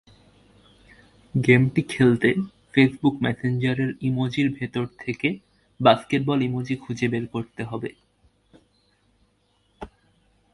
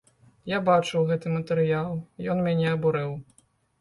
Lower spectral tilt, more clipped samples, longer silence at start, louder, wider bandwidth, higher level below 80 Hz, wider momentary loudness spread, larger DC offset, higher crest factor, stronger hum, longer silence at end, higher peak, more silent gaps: about the same, -7 dB/octave vs -7 dB/octave; neither; first, 1.35 s vs 0.45 s; first, -23 LUFS vs -26 LUFS; about the same, 11.5 kHz vs 11.5 kHz; about the same, -56 dBFS vs -60 dBFS; first, 14 LU vs 11 LU; neither; about the same, 22 dB vs 18 dB; neither; about the same, 0.7 s vs 0.6 s; first, -2 dBFS vs -8 dBFS; neither